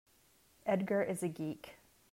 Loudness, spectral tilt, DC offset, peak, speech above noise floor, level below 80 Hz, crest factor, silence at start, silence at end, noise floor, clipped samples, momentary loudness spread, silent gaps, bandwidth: -37 LUFS; -6.5 dB/octave; under 0.1%; -20 dBFS; 33 dB; -76 dBFS; 18 dB; 0.65 s; 0.35 s; -69 dBFS; under 0.1%; 14 LU; none; 16 kHz